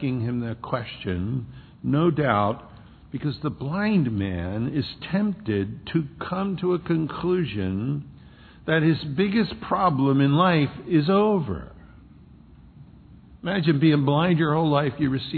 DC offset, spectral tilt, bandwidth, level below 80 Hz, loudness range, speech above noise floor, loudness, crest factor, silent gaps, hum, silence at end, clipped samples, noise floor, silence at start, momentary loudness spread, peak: under 0.1%; -10.5 dB/octave; 4.6 kHz; -50 dBFS; 5 LU; 26 dB; -24 LUFS; 18 dB; none; none; 0 s; under 0.1%; -49 dBFS; 0 s; 11 LU; -6 dBFS